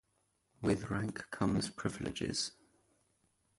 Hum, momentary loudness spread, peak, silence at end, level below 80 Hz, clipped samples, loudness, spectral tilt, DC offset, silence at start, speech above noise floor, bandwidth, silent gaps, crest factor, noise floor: none; 5 LU; -18 dBFS; 1.05 s; -58 dBFS; under 0.1%; -37 LUFS; -5 dB/octave; under 0.1%; 0.6 s; 42 dB; 11.5 kHz; none; 20 dB; -78 dBFS